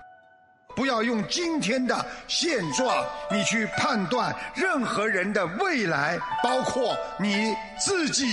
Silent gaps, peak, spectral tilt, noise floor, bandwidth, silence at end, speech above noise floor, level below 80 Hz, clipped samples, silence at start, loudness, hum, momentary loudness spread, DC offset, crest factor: none; -10 dBFS; -3 dB/octave; -57 dBFS; 11.5 kHz; 0 s; 31 dB; -58 dBFS; under 0.1%; 0 s; -25 LUFS; none; 4 LU; under 0.1%; 16 dB